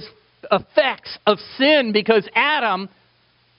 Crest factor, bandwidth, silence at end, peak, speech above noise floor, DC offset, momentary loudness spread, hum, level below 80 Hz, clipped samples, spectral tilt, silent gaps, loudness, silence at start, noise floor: 20 dB; 5.6 kHz; 0.7 s; 0 dBFS; 41 dB; under 0.1%; 7 LU; none; -62 dBFS; under 0.1%; -1.5 dB/octave; none; -18 LUFS; 0 s; -60 dBFS